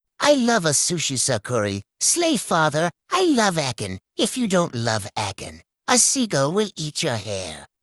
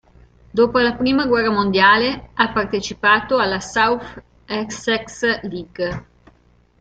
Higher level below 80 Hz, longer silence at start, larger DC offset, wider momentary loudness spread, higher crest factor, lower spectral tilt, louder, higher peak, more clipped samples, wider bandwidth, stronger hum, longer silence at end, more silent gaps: second, -58 dBFS vs -46 dBFS; second, 0.2 s vs 0.55 s; neither; about the same, 12 LU vs 12 LU; about the same, 18 dB vs 18 dB; about the same, -3 dB/octave vs -4 dB/octave; second, -21 LUFS vs -18 LUFS; about the same, -4 dBFS vs -2 dBFS; neither; first, 14 kHz vs 9 kHz; neither; second, 0.15 s vs 0.8 s; neither